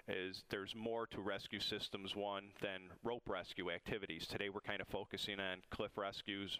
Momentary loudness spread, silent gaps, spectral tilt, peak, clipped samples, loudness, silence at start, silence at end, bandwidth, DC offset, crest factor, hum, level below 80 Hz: 4 LU; none; -4 dB/octave; -26 dBFS; under 0.1%; -45 LUFS; 0.05 s; 0 s; 15.5 kHz; under 0.1%; 20 dB; none; -68 dBFS